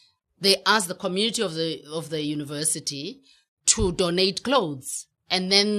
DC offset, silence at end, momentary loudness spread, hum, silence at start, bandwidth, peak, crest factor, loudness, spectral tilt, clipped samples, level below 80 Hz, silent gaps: under 0.1%; 0 s; 12 LU; none; 0.4 s; 13 kHz; -2 dBFS; 22 dB; -23 LUFS; -2.5 dB/octave; under 0.1%; -46 dBFS; 3.48-3.57 s